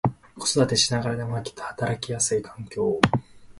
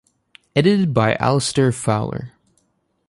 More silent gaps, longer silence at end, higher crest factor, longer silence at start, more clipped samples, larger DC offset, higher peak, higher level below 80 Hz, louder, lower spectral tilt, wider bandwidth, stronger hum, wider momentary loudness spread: neither; second, 0 s vs 0.8 s; first, 26 dB vs 18 dB; second, 0.05 s vs 0.55 s; neither; neither; about the same, 0 dBFS vs -2 dBFS; about the same, -52 dBFS vs -50 dBFS; second, -25 LUFS vs -18 LUFS; second, -4 dB/octave vs -5.5 dB/octave; about the same, 11.5 kHz vs 11.5 kHz; neither; about the same, 10 LU vs 11 LU